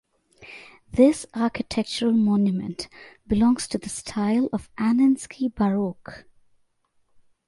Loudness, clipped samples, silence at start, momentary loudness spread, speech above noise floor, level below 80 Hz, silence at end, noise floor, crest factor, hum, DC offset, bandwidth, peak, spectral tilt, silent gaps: -23 LUFS; under 0.1%; 0.4 s; 20 LU; 45 dB; -50 dBFS; 1.25 s; -68 dBFS; 18 dB; none; under 0.1%; 11.5 kHz; -6 dBFS; -6 dB/octave; none